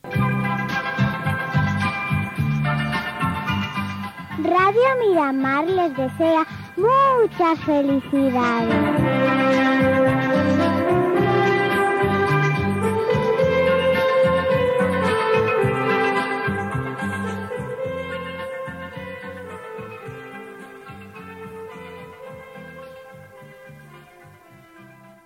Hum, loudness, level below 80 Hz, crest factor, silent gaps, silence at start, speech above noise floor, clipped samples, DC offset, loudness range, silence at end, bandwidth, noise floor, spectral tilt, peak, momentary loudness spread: none; -20 LUFS; -48 dBFS; 12 dB; none; 0.05 s; 29 dB; under 0.1%; under 0.1%; 18 LU; 0.4 s; 16 kHz; -47 dBFS; -7 dB/octave; -8 dBFS; 19 LU